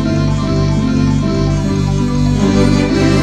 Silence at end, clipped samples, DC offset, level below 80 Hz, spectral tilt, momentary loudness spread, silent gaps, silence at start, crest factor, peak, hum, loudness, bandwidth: 0 s; under 0.1%; under 0.1%; -24 dBFS; -7 dB/octave; 3 LU; none; 0 s; 12 dB; 0 dBFS; 50 Hz at -35 dBFS; -14 LUFS; 9.6 kHz